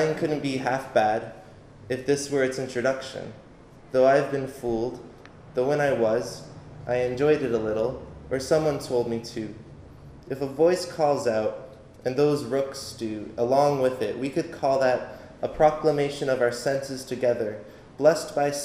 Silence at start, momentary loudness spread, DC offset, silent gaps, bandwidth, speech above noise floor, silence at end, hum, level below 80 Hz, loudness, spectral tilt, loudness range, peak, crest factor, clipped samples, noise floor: 0 s; 15 LU; under 0.1%; none; 15.5 kHz; 24 dB; 0 s; none; -54 dBFS; -25 LUFS; -5.5 dB/octave; 3 LU; -6 dBFS; 20 dB; under 0.1%; -49 dBFS